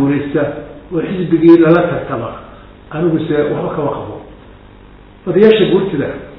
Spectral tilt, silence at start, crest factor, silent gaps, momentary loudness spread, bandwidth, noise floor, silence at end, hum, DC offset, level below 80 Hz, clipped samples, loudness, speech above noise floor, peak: -10 dB/octave; 0 s; 14 dB; none; 19 LU; 5 kHz; -39 dBFS; 0 s; 50 Hz at -40 dBFS; under 0.1%; -42 dBFS; 0.6%; -13 LUFS; 26 dB; 0 dBFS